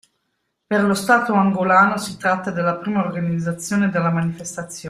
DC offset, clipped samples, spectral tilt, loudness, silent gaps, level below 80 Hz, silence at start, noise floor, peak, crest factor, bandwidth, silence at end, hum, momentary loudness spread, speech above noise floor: under 0.1%; under 0.1%; -5.5 dB/octave; -19 LUFS; none; -60 dBFS; 0.7 s; -73 dBFS; -2 dBFS; 18 dB; 14.5 kHz; 0 s; none; 8 LU; 54 dB